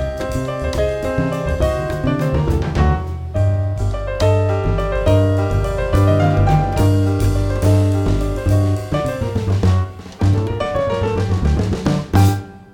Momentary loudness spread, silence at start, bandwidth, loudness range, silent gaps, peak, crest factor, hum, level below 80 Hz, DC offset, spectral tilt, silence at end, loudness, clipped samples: 6 LU; 0 s; 16 kHz; 3 LU; none; -2 dBFS; 14 dB; none; -26 dBFS; under 0.1%; -7.5 dB/octave; 0.1 s; -18 LUFS; under 0.1%